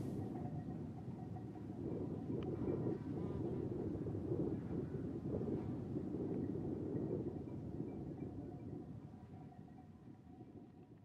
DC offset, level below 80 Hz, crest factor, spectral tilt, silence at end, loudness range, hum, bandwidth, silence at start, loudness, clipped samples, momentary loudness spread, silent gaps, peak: under 0.1%; -62 dBFS; 16 dB; -10.5 dB/octave; 0 s; 7 LU; none; 11.5 kHz; 0 s; -45 LUFS; under 0.1%; 15 LU; none; -28 dBFS